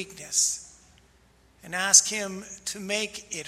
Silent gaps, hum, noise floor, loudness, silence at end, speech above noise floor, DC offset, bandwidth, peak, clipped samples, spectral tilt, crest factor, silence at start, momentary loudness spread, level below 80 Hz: none; none; -60 dBFS; -23 LUFS; 0 s; 33 dB; under 0.1%; 16 kHz; -2 dBFS; under 0.1%; 0 dB/octave; 26 dB; 0 s; 18 LU; -64 dBFS